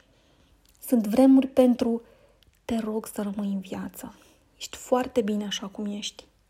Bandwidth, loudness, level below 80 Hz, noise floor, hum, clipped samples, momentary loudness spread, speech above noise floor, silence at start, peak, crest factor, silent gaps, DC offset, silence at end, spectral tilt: 16 kHz; -25 LUFS; -60 dBFS; -61 dBFS; none; under 0.1%; 20 LU; 36 dB; 0.85 s; -6 dBFS; 20 dB; none; under 0.1%; 0.4 s; -5.5 dB/octave